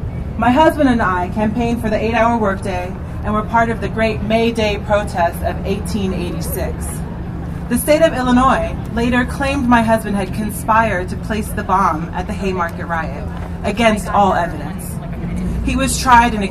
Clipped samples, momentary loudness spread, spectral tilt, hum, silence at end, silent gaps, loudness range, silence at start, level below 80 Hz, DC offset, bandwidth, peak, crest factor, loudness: under 0.1%; 12 LU; -5.5 dB/octave; none; 0 s; none; 3 LU; 0 s; -28 dBFS; under 0.1%; 14.5 kHz; 0 dBFS; 16 dB; -17 LUFS